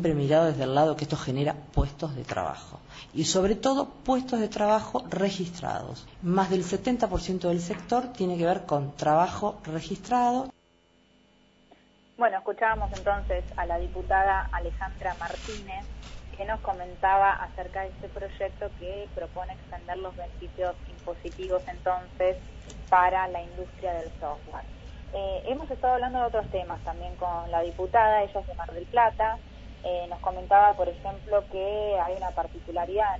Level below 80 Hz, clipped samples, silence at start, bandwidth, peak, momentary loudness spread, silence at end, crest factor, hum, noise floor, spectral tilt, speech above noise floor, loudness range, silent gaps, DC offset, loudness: -42 dBFS; under 0.1%; 0 s; 8 kHz; -8 dBFS; 15 LU; 0 s; 20 dB; none; -63 dBFS; -5.5 dB/octave; 35 dB; 5 LU; none; under 0.1%; -28 LUFS